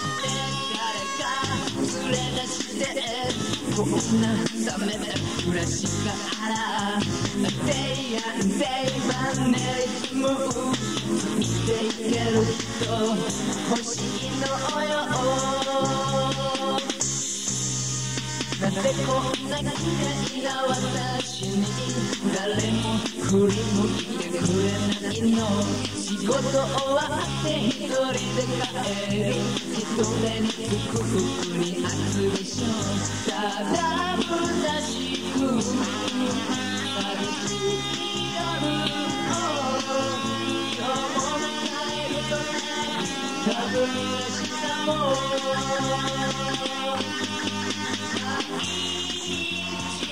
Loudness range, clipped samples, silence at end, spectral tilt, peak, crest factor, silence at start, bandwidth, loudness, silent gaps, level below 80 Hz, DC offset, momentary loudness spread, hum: 2 LU; under 0.1%; 0 s; -4 dB/octave; -8 dBFS; 16 dB; 0 s; 16 kHz; -25 LUFS; none; -50 dBFS; 0.4%; 4 LU; none